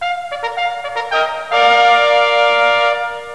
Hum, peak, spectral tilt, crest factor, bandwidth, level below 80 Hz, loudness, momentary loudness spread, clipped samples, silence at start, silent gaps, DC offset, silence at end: none; 0 dBFS; -1 dB/octave; 14 dB; 11 kHz; -58 dBFS; -14 LUFS; 11 LU; under 0.1%; 0 s; none; 0.6%; 0 s